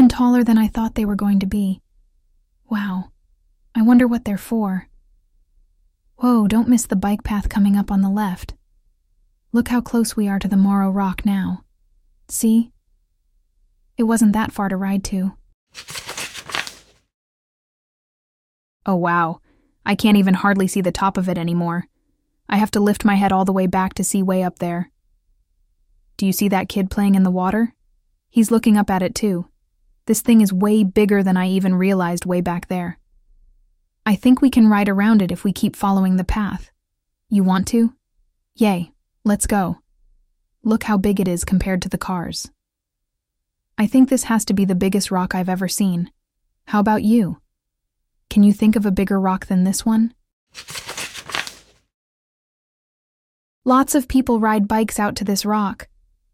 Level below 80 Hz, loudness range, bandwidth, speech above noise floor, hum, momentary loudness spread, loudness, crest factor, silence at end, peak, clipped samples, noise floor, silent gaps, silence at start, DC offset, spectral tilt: -42 dBFS; 6 LU; 16 kHz; 62 dB; none; 13 LU; -18 LUFS; 18 dB; 0.5 s; -2 dBFS; under 0.1%; -79 dBFS; 15.54-15.67 s, 17.14-18.80 s, 50.33-50.47 s, 51.94-53.62 s; 0 s; under 0.1%; -6 dB/octave